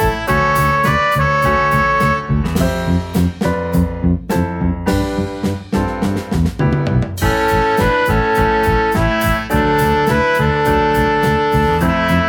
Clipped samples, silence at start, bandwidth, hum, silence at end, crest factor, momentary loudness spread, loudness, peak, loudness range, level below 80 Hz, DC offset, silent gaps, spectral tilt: under 0.1%; 0 s; 19 kHz; none; 0 s; 14 dB; 5 LU; -15 LUFS; -2 dBFS; 4 LU; -26 dBFS; under 0.1%; none; -6.5 dB/octave